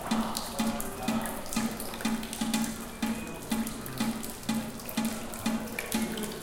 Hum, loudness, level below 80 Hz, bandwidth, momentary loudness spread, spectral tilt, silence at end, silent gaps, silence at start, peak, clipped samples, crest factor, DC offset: none; -33 LUFS; -48 dBFS; 17 kHz; 3 LU; -3.5 dB/octave; 0 s; none; 0 s; -10 dBFS; under 0.1%; 24 dB; under 0.1%